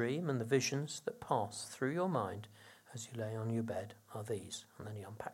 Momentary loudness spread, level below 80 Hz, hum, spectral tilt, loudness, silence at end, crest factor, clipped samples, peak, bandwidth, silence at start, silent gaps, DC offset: 15 LU; -78 dBFS; none; -5 dB/octave; -39 LUFS; 0 s; 22 dB; under 0.1%; -18 dBFS; 16.5 kHz; 0 s; none; under 0.1%